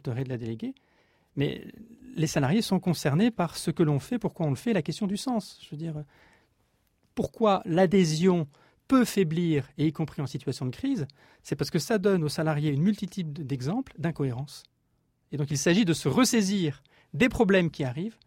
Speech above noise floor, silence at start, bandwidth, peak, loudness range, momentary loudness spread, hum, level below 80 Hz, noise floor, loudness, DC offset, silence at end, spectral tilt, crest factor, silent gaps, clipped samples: 45 dB; 0.05 s; 16 kHz; -10 dBFS; 5 LU; 15 LU; none; -56 dBFS; -72 dBFS; -27 LUFS; under 0.1%; 0.15 s; -6 dB/octave; 18 dB; none; under 0.1%